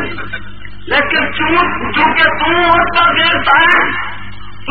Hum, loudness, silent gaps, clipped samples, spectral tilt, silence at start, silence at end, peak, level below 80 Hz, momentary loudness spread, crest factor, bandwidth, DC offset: 50 Hz at -35 dBFS; -11 LUFS; none; under 0.1%; -6 dB/octave; 0 s; 0 s; 0 dBFS; -36 dBFS; 18 LU; 14 dB; 8 kHz; 7%